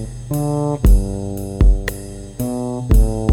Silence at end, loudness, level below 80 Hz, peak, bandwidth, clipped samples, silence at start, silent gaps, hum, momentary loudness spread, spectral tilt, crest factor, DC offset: 0 s; -19 LUFS; -18 dBFS; -2 dBFS; 15.5 kHz; under 0.1%; 0 s; none; none; 10 LU; -7 dB/octave; 14 dB; under 0.1%